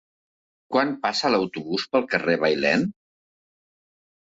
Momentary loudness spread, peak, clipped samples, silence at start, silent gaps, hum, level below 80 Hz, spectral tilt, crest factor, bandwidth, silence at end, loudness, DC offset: 6 LU; -6 dBFS; under 0.1%; 0.7 s; none; none; -64 dBFS; -5 dB/octave; 20 dB; 7.8 kHz; 1.4 s; -23 LUFS; under 0.1%